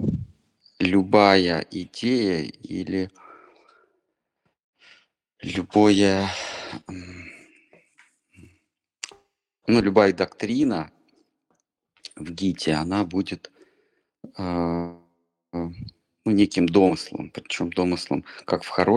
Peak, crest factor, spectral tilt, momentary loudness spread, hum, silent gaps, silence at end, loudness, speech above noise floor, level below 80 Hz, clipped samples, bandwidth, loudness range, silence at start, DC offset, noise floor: -2 dBFS; 24 dB; -5.5 dB/octave; 20 LU; none; 4.64-4.73 s; 0 s; -23 LUFS; 55 dB; -54 dBFS; under 0.1%; 11 kHz; 9 LU; 0 s; under 0.1%; -77 dBFS